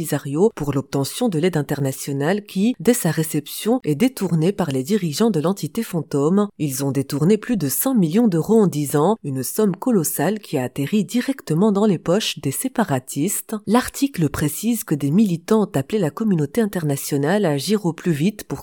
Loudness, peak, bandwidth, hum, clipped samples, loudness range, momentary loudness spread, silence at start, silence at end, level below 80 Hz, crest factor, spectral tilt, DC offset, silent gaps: -20 LUFS; -2 dBFS; 19 kHz; none; under 0.1%; 2 LU; 6 LU; 0 s; 0 s; -52 dBFS; 18 dB; -5.5 dB/octave; under 0.1%; none